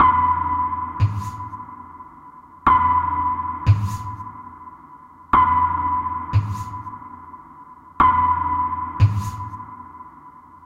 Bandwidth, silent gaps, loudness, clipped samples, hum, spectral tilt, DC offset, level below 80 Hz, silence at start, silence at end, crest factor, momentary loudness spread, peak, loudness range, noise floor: 11 kHz; none; -20 LUFS; under 0.1%; none; -7 dB/octave; under 0.1%; -40 dBFS; 0 s; 0.1 s; 18 dB; 24 LU; -4 dBFS; 2 LU; -44 dBFS